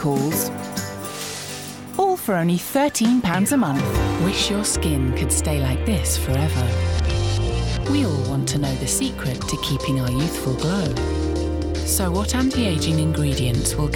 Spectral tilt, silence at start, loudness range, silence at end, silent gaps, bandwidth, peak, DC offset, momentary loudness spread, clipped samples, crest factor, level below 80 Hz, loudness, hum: -5 dB/octave; 0 s; 3 LU; 0 s; none; 19 kHz; -8 dBFS; 0.1%; 6 LU; under 0.1%; 14 dB; -32 dBFS; -21 LUFS; none